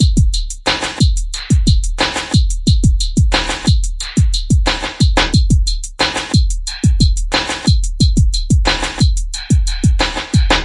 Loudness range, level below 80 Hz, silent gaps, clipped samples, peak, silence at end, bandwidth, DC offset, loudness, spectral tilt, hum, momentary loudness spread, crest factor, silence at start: 1 LU; -16 dBFS; none; under 0.1%; 0 dBFS; 0 s; 11.5 kHz; under 0.1%; -15 LUFS; -4.5 dB/octave; none; 4 LU; 14 dB; 0 s